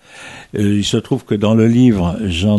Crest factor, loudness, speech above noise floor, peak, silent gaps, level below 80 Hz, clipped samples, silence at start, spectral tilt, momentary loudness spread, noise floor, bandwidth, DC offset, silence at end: 14 dB; -15 LUFS; 22 dB; -2 dBFS; none; -38 dBFS; under 0.1%; 0.15 s; -6.5 dB/octave; 14 LU; -36 dBFS; 12 kHz; under 0.1%; 0 s